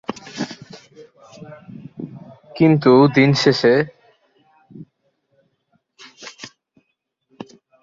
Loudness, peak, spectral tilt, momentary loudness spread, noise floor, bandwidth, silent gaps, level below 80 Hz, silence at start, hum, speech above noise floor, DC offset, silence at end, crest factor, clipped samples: -16 LUFS; -2 dBFS; -6.5 dB/octave; 28 LU; -73 dBFS; 7.6 kHz; none; -60 dBFS; 0.1 s; none; 59 dB; under 0.1%; 1.35 s; 20 dB; under 0.1%